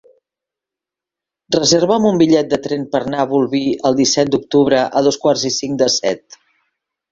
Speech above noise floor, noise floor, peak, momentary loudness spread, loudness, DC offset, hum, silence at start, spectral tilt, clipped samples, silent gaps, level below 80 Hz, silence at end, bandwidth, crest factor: 71 dB; -86 dBFS; 0 dBFS; 7 LU; -15 LUFS; under 0.1%; none; 1.5 s; -4 dB/octave; under 0.1%; none; -54 dBFS; 0.95 s; 7.8 kHz; 16 dB